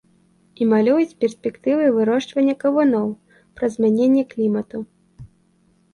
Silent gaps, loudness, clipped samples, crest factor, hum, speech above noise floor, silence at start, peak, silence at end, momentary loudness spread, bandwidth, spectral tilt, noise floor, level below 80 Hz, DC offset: none; -19 LUFS; under 0.1%; 14 dB; none; 41 dB; 0.6 s; -6 dBFS; 0.65 s; 10 LU; 11 kHz; -7 dB/octave; -60 dBFS; -60 dBFS; under 0.1%